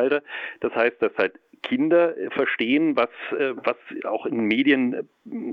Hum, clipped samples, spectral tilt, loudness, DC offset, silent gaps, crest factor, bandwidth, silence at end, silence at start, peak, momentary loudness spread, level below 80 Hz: none; under 0.1%; -7.5 dB/octave; -23 LUFS; under 0.1%; none; 18 dB; 5.4 kHz; 0 s; 0 s; -6 dBFS; 11 LU; -70 dBFS